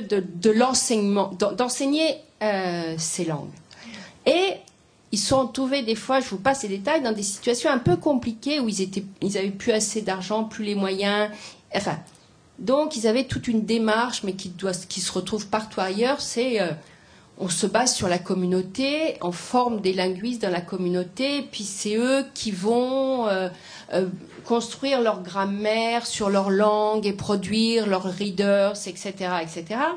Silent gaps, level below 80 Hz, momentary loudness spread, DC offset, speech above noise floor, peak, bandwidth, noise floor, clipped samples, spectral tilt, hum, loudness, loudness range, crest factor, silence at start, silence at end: none; -58 dBFS; 8 LU; under 0.1%; 31 dB; -6 dBFS; 10.5 kHz; -55 dBFS; under 0.1%; -4 dB/octave; none; -24 LUFS; 3 LU; 18 dB; 0 s; 0 s